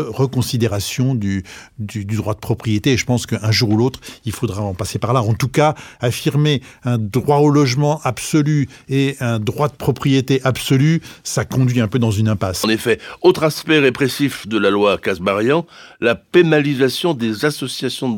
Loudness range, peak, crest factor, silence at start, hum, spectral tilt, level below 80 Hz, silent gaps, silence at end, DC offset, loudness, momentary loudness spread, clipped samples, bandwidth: 3 LU; 0 dBFS; 16 dB; 0 s; none; -5.5 dB/octave; -50 dBFS; none; 0 s; under 0.1%; -17 LUFS; 8 LU; under 0.1%; 18 kHz